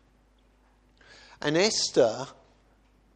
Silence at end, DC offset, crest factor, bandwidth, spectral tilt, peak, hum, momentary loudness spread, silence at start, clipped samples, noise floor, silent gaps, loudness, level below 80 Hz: 0.85 s; under 0.1%; 22 dB; 9.8 kHz; -3 dB/octave; -8 dBFS; none; 14 LU; 1.4 s; under 0.1%; -62 dBFS; none; -25 LUFS; -64 dBFS